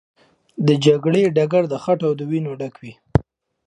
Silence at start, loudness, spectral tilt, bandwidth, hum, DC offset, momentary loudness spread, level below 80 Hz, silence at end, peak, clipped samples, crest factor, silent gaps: 0.6 s; -19 LUFS; -7 dB/octave; 10.5 kHz; none; under 0.1%; 13 LU; -42 dBFS; 0.45 s; 0 dBFS; under 0.1%; 20 dB; none